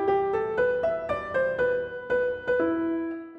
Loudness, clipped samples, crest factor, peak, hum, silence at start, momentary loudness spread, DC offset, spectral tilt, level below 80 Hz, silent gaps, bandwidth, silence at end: -27 LUFS; under 0.1%; 12 dB; -14 dBFS; none; 0 s; 4 LU; under 0.1%; -7.5 dB/octave; -56 dBFS; none; 5.6 kHz; 0 s